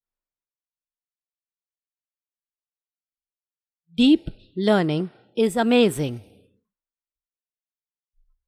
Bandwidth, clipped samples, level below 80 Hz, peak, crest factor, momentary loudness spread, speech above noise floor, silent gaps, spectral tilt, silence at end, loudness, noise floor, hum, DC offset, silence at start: 15 kHz; under 0.1%; -54 dBFS; -8 dBFS; 20 dB; 14 LU; over 70 dB; none; -6 dB/octave; 2.25 s; -21 LUFS; under -90 dBFS; none; under 0.1%; 4 s